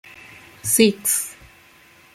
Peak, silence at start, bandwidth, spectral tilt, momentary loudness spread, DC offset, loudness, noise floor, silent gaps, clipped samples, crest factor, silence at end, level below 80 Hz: 0 dBFS; 0.65 s; 16.5 kHz; -2.5 dB/octave; 16 LU; under 0.1%; -18 LUFS; -51 dBFS; none; under 0.1%; 24 dB; 0.8 s; -60 dBFS